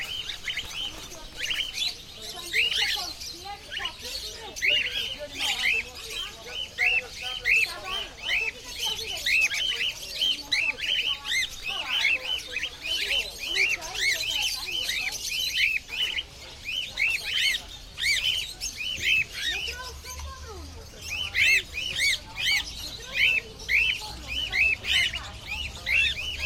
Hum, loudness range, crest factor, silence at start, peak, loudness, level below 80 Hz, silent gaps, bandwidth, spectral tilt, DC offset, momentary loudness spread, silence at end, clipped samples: none; 3 LU; 18 dB; 0 s; -10 dBFS; -25 LUFS; -48 dBFS; none; 16.5 kHz; 0 dB/octave; under 0.1%; 12 LU; 0 s; under 0.1%